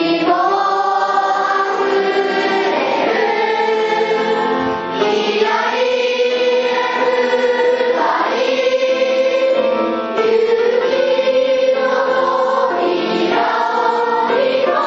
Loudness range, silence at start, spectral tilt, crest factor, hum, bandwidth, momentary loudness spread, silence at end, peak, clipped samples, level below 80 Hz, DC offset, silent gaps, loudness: 1 LU; 0 s; -4 dB/octave; 14 dB; none; 7.8 kHz; 2 LU; 0 s; -2 dBFS; under 0.1%; -64 dBFS; under 0.1%; none; -15 LUFS